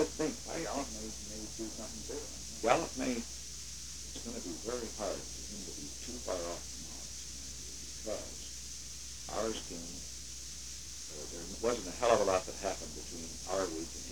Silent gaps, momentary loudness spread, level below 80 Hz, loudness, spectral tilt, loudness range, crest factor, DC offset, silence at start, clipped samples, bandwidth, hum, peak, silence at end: none; 11 LU; -54 dBFS; -38 LUFS; -3 dB/octave; 6 LU; 26 dB; 0.2%; 0 s; under 0.1%; 19 kHz; none; -12 dBFS; 0 s